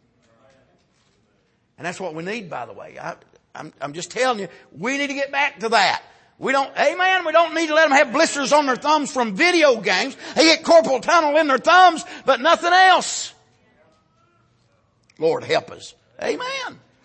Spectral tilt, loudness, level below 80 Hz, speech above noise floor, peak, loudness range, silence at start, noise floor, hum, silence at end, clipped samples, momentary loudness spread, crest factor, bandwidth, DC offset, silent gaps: -2.5 dB/octave; -18 LUFS; -68 dBFS; 45 dB; -2 dBFS; 13 LU; 1.8 s; -64 dBFS; none; 0.3 s; under 0.1%; 19 LU; 18 dB; 8.8 kHz; under 0.1%; none